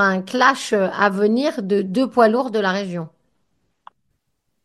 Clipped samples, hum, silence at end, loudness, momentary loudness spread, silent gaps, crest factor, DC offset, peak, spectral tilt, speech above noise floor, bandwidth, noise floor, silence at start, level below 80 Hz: under 0.1%; none; 1.55 s; -18 LUFS; 9 LU; none; 20 dB; under 0.1%; 0 dBFS; -5 dB/octave; 55 dB; 12.5 kHz; -73 dBFS; 0 s; -68 dBFS